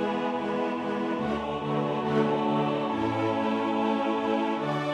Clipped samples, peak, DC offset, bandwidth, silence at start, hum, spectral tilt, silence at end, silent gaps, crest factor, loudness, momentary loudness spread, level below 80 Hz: under 0.1%; -12 dBFS; under 0.1%; 10 kHz; 0 s; none; -7 dB/octave; 0 s; none; 16 dB; -28 LUFS; 4 LU; -60 dBFS